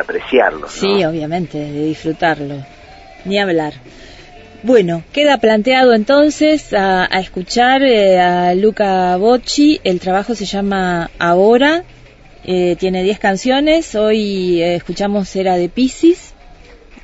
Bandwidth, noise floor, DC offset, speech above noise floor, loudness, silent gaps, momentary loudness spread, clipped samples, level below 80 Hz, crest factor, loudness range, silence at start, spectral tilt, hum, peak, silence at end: 8 kHz; -40 dBFS; under 0.1%; 27 dB; -14 LUFS; none; 10 LU; under 0.1%; -42 dBFS; 14 dB; 6 LU; 0 s; -5 dB/octave; none; 0 dBFS; 0.5 s